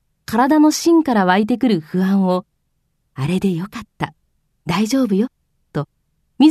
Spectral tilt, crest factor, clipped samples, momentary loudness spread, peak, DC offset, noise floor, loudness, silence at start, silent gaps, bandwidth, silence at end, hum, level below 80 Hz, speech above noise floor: -6 dB/octave; 16 dB; under 0.1%; 15 LU; -2 dBFS; under 0.1%; -68 dBFS; -17 LUFS; 0.3 s; none; 14 kHz; 0 s; none; -54 dBFS; 51 dB